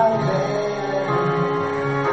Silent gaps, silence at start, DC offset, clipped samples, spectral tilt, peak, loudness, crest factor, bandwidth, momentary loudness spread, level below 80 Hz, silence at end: none; 0 s; 0.3%; under 0.1%; -7 dB/octave; -8 dBFS; -21 LUFS; 14 dB; 8 kHz; 3 LU; -54 dBFS; 0 s